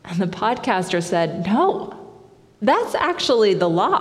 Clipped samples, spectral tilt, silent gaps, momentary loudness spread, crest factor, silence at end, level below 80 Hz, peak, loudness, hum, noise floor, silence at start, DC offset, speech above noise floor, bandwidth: under 0.1%; -5 dB/octave; none; 6 LU; 16 dB; 0 s; -60 dBFS; -4 dBFS; -20 LUFS; none; -48 dBFS; 0.05 s; under 0.1%; 29 dB; 13.5 kHz